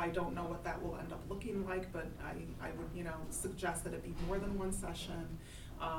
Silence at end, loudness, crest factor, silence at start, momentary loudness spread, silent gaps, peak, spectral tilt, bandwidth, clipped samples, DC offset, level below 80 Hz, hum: 0 s; -42 LUFS; 18 dB; 0 s; 6 LU; none; -24 dBFS; -5 dB/octave; 19 kHz; under 0.1%; under 0.1%; -50 dBFS; none